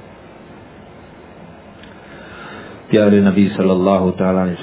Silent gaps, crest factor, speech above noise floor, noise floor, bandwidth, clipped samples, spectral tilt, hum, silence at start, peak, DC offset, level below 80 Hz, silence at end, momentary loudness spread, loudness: none; 16 dB; 26 dB; -39 dBFS; 4 kHz; under 0.1%; -12 dB/octave; none; 0.55 s; 0 dBFS; under 0.1%; -46 dBFS; 0 s; 23 LU; -14 LUFS